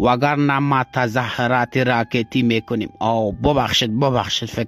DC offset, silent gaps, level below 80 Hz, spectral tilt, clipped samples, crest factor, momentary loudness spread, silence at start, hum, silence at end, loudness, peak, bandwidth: under 0.1%; none; -42 dBFS; -5.5 dB/octave; under 0.1%; 14 dB; 4 LU; 0 s; none; 0 s; -19 LUFS; -4 dBFS; 15 kHz